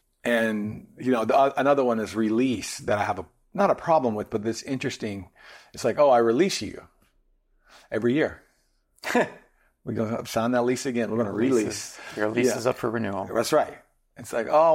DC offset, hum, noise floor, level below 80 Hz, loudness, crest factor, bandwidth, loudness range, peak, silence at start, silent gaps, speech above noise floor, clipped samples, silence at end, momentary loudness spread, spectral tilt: under 0.1%; none; -68 dBFS; -62 dBFS; -25 LUFS; 16 dB; 16.5 kHz; 4 LU; -10 dBFS; 0.25 s; none; 43 dB; under 0.1%; 0 s; 13 LU; -5 dB/octave